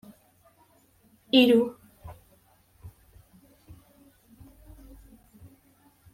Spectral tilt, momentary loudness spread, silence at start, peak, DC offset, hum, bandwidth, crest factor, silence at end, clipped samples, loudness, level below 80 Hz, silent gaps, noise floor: -5 dB/octave; 30 LU; 1.35 s; -8 dBFS; under 0.1%; none; 16 kHz; 24 dB; 3.25 s; under 0.1%; -22 LUFS; -58 dBFS; none; -62 dBFS